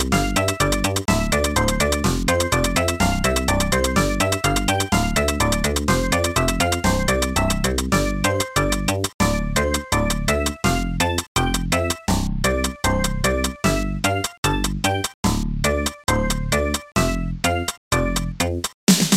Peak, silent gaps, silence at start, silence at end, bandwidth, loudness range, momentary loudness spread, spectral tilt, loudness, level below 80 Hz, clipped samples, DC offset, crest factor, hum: -2 dBFS; 9.14-9.19 s, 11.27-11.35 s, 14.38-14.43 s, 15.14-15.23 s, 17.77-17.91 s, 18.74-18.87 s; 0 s; 0 s; 16.5 kHz; 2 LU; 3 LU; -4 dB/octave; -21 LUFS; -28 dBFS; under 0.1%; under 0.1%; 18 dB; none